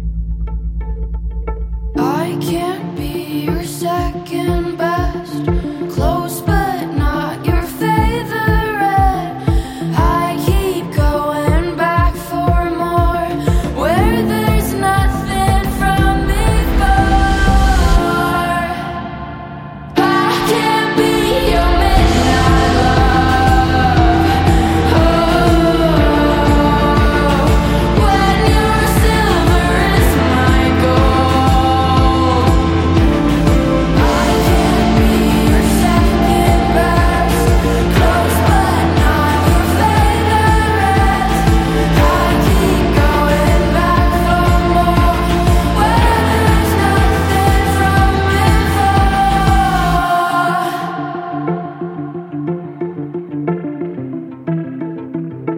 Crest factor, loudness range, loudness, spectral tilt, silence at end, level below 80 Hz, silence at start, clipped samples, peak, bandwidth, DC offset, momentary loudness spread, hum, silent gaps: 12 dB; 7 LU; -14 LUFS; -6 dB/octave; 0 s; -18 dBFS; 0 s; under 0.1%; 0 dBFS; 16.5 kHz; under 0.1%; 10 LU; none; none